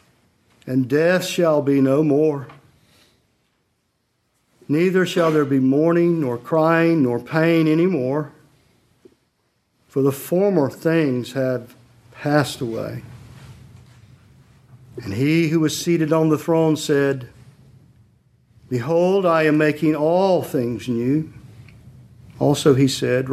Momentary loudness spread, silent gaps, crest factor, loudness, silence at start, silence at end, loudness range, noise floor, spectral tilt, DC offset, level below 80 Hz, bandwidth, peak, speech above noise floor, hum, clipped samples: 11 LU; none; 20 dB; -19 LUFS; 0.65 s; 0 s; 6 LU; -69 dBFS; -6.5 dB/octave; under 0.1%; -58 dBFS; 16 kHz; 0 dBFS; 51 dB; none; under 0.1%